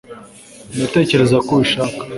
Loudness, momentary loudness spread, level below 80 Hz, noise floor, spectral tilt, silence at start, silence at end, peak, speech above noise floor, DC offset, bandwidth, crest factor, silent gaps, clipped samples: -15 LUFS; 9 LU; -48 dBFS; -40 dBFS; -5.5 dB/octave; 0.1 s; 0 s; 0 dBFS; 25 dB; under 0.1%; 11.5 kHz; 16 dB; none; under 0.1%